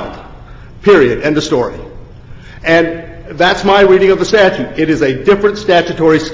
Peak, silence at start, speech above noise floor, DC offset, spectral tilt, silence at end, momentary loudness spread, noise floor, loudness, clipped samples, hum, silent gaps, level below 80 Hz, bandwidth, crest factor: 0 dBFS; 0 s; 22 dB; under 0.1%; -5.5 dB/octave; 0 s; 12 LU; -32 dBFS; -11 LUFS; under 0.1%; none; none; -36 dBFS; 7.6 kHz; 12 dB